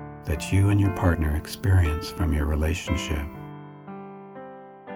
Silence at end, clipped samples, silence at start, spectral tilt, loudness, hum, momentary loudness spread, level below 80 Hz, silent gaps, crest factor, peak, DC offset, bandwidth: 0 s; under 0.1%; 0 s; -6.5 dB/octave; -25 LUFS; none; 20 LU; -32 dBFS; none; 18 dB; -6 dBFS; under 0.1%; 16.5 kHz